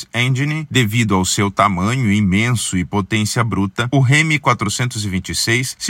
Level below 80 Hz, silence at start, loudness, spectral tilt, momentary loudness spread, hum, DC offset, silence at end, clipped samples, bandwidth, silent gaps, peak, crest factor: -48 dBFS; 0 s; -16 LUFS; -4.5 dB/octave; 6 LU; none; under 0.1%; 0 s; under 0.1%; 16.5 kHz; none; 0 dBFS; 16 dB